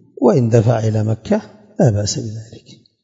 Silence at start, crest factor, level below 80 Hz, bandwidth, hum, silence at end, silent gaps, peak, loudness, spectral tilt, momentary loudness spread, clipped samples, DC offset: 0.2 s; 16 dB; -52 dBFS; 7.8 kHz; none; 0.3 s; none; 0 dBFS; -16 LUFS; -6.5 dB/octave; 14 LU; under 0.1%; under 0.1%